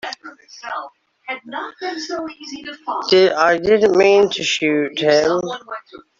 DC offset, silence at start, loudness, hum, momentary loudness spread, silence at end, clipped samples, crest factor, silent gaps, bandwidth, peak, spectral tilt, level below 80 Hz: under 0.1%; 0.05 s; -16 LUFS; none; 20 LU; 0.2 s; under 0.1%; 18 dB; none; 7.6 kHz; 0 dBFS; -4 dB/octave; -58 dBFS